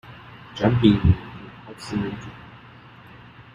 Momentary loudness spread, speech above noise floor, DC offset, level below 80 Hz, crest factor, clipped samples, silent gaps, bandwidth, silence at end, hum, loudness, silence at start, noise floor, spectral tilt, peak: 26 LU; 26 dB; under 0.1%; -40 dBFS; 22 dB; under 0.1%; none; 10.5 kHz; 1 s; none; -21 LUFS; 0.1 s; -46 dBFS; -8 dB/octave; -2 dBFS